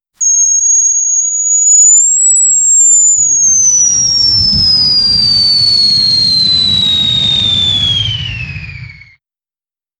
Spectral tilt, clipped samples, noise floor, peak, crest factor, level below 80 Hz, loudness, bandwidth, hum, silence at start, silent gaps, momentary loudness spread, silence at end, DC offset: 0.5 dB/octave; under 0.1%; under -90 dBFS; 0 dBFS; 10 dB; -36 dBFS; -6 LUFS; 12 kHz; none; 0.2 s; none; 6 LU; 1.05 s; under 0.1%